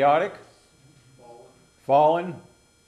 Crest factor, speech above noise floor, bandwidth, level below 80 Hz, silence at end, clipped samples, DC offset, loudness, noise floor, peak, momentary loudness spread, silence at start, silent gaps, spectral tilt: 18 dB; 35 dB; 12 kHz; -70 dBFS; 0.45 s; under 0.1%; under 0.1%; -22 LUFS; -56 dBFS; -8 dBFS; 22 LU; 0 s; none; -6.5 dB/octave